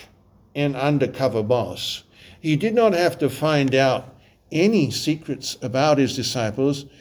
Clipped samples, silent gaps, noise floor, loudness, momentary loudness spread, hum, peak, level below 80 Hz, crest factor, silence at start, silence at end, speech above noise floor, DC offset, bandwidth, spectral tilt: under 0.1%; none; -54 dBFS; -21 LUFS; 10 LU; none; -6 dBFS; -56 dBFS; 16 dB; 0 s; 0.15 s; 33 dB; under 0.1%; over 20 kHz; -5.5 dB/octave